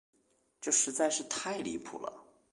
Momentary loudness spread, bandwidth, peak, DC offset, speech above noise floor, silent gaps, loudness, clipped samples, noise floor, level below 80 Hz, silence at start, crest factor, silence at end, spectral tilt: 15 LU; 11.5 kHz; -16 dBFS; under 0.1%; 25 dB; none; -32 LUFS; under 0.1%; -58 dBFS; -74 dBFS; 0.6 s; 20 dB; 0.3 s; -1.5 dB/octave